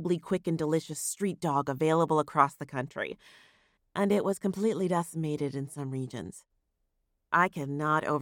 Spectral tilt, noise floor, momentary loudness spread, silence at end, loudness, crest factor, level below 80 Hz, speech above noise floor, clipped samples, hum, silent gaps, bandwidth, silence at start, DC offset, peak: -5.5 dB/octave; -78 dBFS; 10 LU; 0 s; -30 LUFS; 22 dB; -70 dBFS; 48 dB; under 0.1%; none; none; 17.5 kHz; 0 s; under 0.1%; -8 dBFS